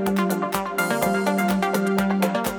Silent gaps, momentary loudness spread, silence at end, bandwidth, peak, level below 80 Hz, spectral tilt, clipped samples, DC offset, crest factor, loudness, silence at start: none; 2 LU; 0 s; over 20 kHz; -6 dBFS; -52 dBFS; -5.5 dB/octave; under 0.1%; under 0.1%; 16 dB; -22 LUFS; 0 s